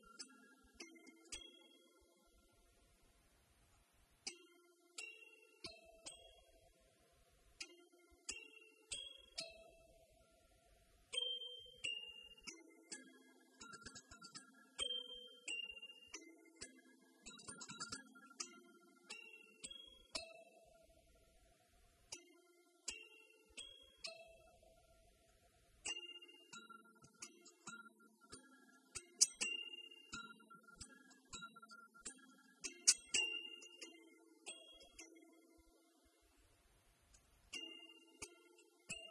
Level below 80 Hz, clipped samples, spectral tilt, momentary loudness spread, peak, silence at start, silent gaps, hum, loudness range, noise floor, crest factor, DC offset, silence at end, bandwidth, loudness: -78 dBFS; under 0.1%; 1 dB/octave; 21 LU; -16 dBFS; 0 s; none; none; 17 LU; -74 dBFS; 38 dB; under 0.1%; 0 s; 12 kHz; -47 LUFS